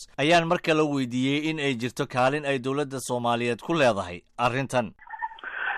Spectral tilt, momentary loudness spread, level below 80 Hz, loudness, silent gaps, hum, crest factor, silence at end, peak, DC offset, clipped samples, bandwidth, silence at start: -5 dB/octave; 12 LU; -58 dBFS; -25 LUFS; none; none; 14 dB; 0 s; -12 dBFS; under 0.1%; under 0.1%; 14.5 kHz; 0 s